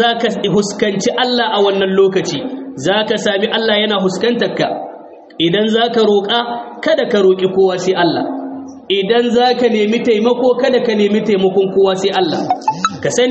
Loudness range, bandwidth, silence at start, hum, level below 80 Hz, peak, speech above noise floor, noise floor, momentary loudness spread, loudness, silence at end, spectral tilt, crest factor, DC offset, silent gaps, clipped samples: 2 LU; 8.4 kHz; 0 s; none; -56 dBFS; 0 dBFS; 21 dB; -34 dBFS; 7 LU; -14 LUFS; 0 s; -4.5 dB/octave; 14 dB; under 0.1%; none; under 0.1%